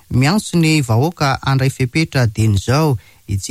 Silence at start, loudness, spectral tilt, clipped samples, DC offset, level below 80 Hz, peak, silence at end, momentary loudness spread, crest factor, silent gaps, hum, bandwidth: 0.1 s; -16 LUFS; -6 dB/octave; under 0.1%; under 0.1%; -40 dBFS; -4 dBFS; 0 s; 4 LU; 12 dB; none; none; 15.5 kHz